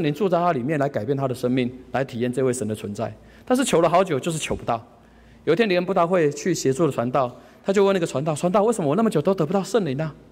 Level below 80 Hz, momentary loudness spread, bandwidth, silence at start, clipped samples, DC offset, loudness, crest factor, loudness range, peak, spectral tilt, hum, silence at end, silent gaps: -54 dBFS; 9 LU; 16 kHz; 0 s; under 0.1%; under 0.1%; -22 LUFS; 14 dB; 2 LU; -8 dBFS; -5.5 dB/octave; none; 0.15 s; none